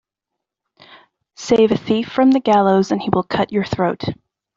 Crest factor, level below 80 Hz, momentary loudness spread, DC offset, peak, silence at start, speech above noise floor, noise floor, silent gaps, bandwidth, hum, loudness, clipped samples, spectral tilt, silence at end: 16 dB; -54 dBFS; 12 LU; under 0.1%; -2 dBFS; 1.4 s; 65 dB; -82 dBFS; none; 7.6 kHz; none; -17 LUFS; under 0.1%; -6.5 dB/octave; 0.45 s